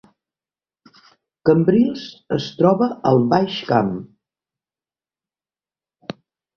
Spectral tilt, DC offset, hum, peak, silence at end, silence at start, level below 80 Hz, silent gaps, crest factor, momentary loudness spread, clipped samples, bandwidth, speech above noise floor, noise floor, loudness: -8 dB/octave; under 0.1%; none; -2 dBFS; 0.45 s; 1.45 s; -58 dBFS; none; 20 dB; 20 LU; under 0.1%; 6.6 kHz; over 73 dB; under -90 dBFS; -18 LUFS